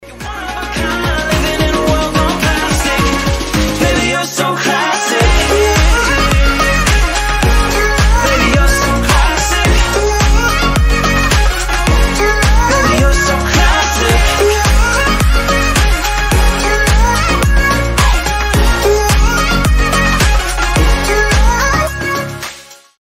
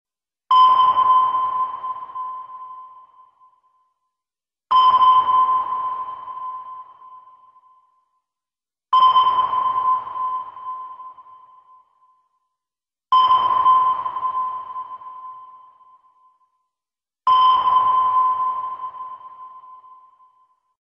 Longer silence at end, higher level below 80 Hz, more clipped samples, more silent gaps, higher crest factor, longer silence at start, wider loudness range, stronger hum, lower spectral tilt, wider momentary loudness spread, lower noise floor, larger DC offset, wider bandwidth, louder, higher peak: second, 0.25 s vs 1.05 s; first, -14 dBFS vs -66 dBFS; neither; neither; about the same, 12 dB vs 14 dB; second, 0 s vs 0.5 s; second, 2 LU vs 9 LU; neither; about the same, -4 dB/octave vs -3.5 dB/octave; second, 4 LU vs 23 LU; second, -34 dBFS vs under -90 dBFS; neither; first, 16.5 kHz vs 5.6 kHz; first, -12 LUFS vs -17 LUFS; first, 0 dBFS vs -6 dBFS